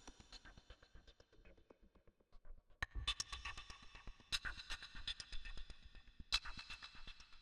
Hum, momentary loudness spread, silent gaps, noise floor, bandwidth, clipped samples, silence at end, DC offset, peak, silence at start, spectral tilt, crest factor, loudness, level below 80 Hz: none; 26 LU; none; -70 dBFS; 12.5 kHz; under 0.1%; 0 s; under 0.1%; -24 dBFS; 0 s; -1 dB/octave; 28 dB; -47 LUFS; -56 dBFS